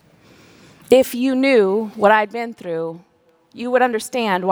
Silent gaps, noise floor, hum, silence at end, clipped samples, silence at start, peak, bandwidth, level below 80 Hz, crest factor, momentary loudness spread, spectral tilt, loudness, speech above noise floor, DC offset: none; -49 dBFS; none; 0 s; under 0.1%; 0.9 s; 0 dBFS; over 20 kHz; -62 dBFS; 18 dB; 12 LU; -4.5 dB/octave; -18 LUFS; 32 dB; under 0.1%